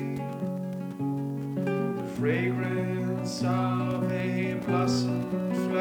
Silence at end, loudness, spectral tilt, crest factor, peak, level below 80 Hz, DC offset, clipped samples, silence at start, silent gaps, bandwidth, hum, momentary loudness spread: 0 s; -29 LUFS; -7 dB/octave; 14 dB; -14 dBFS; -64 dBFS; under 0.1%; under 0.1%; 0 s; none; 18.5 kHz; none; 6 LU